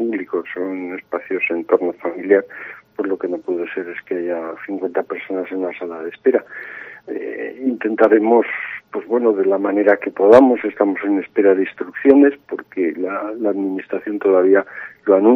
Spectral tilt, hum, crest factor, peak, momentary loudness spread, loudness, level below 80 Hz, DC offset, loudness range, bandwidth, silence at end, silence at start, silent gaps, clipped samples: -8 dB/octave; none; 18 dB; 0 dBFS; 15 LU; -18 LUFS; -66 dBFS; under 0.1%; 9 LU; 6 kHz; 0 s; 0 s; none; under 0.1%